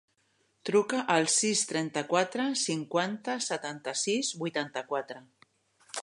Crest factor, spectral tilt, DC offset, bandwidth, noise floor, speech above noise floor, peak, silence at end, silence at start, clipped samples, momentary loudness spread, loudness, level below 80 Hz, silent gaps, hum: 22 dB; -2.5 dB/octave; under 0.1%; 11.5 kHz; -72 dBFS; 42 dB; -10 dBFS; 0 s; 0.65 s; under 0.1%; 10 LU; -29 LUFS; -82 dBFS; none; none